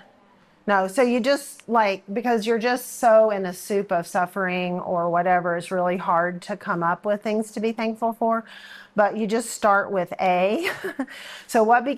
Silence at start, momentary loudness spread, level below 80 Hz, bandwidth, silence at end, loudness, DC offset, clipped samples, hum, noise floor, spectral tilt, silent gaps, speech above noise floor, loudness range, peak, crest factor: 0.65 s; 8 LU; -72 dBFS; 15 kHz; 0 s; -23 LUFS; under 0.1%; under 0.1%; none; -56 dBFS; -5 dB/octave; none; 34 dB; 3 LU; -6 dBFS; 16 dB